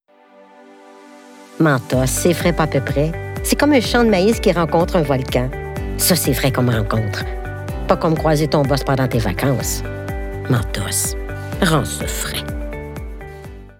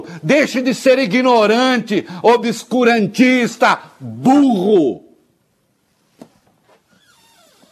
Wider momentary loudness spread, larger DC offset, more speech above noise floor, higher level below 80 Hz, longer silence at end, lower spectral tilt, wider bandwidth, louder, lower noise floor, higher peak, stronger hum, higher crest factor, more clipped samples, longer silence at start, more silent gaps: first, 13 LU vs 7 LU; neither; second, 31 dB vs 49 dB; first, -30 dBFS vs -68 dBFS; second, 0.05 s vs 2.75 s; about the same, -5 dB/octave vs -5 dB/octave; first, 17.5 kHz vs 13.5 kHz; second, -18 LUFS vs -14 LUFS; second, -48 dBFS vs -62 dBFS; about the same, -2 dBFS vs 0 dBFS; neither; about the same, 16 dB vs 16 dB; neither; first, 0.85 s vs 0 s; neither